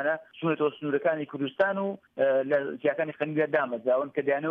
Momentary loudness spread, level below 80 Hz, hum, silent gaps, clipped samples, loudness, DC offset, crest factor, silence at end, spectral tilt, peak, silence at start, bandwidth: 5 LU; -78 dBFS; none; none; under 0.1%; -28 LUFS; under 0.1%; 16 dB; 0 s; -8.5 dB/octave; -12 dBFS; 0 s; 4.9 kHz